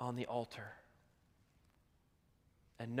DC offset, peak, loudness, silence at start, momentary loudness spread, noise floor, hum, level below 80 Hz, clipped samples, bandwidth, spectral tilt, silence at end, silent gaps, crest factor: under 0.1%; -24 dBFS; -45 LUFS; 0 s; 14 LU; -74 dBFS; none; -78 dBFS; under 0.1%; 15.5 kHz; -6.5 dB/octave; 0 s; none; 22 dB